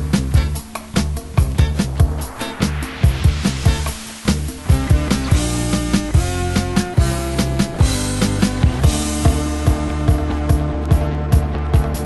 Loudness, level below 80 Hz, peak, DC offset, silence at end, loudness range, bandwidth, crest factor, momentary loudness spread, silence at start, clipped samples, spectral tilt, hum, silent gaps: -18 LUFS; -20 dBFS; 0 dBFS; under 0.1%; 0 s; 1 LU; 12.5 kHz; 16 dB; 5 LU; 0 s; under 0.1%; -5.5 dB/octave; none; none